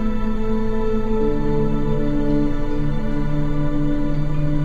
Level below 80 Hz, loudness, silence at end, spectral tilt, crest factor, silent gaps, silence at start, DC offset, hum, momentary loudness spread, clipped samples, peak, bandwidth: -22 dBFS; -23 LUFS; 0 s; -9 dB/octave; 10 dB; none; 0 s; under 0.1%; none; 3 LU; under 0.1%; -6 dBFS; 4.7 kHz